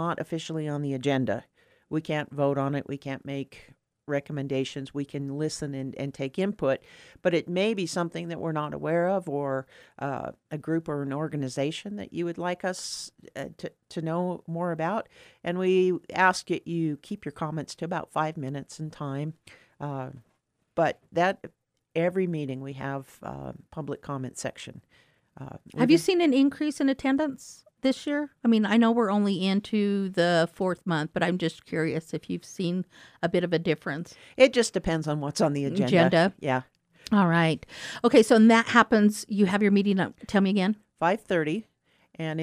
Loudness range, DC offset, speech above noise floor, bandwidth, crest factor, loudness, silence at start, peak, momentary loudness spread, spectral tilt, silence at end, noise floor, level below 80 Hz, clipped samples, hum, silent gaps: 11 LU; under 0.1%; 46 dB; 13.5 kHz; 22 dB; -27 LUFS; 0 s; -4 dBFS; 15 LU; -6 dB/octave; 0 s; -73 dBFS; -60 dBFS; under 0.1%; none; none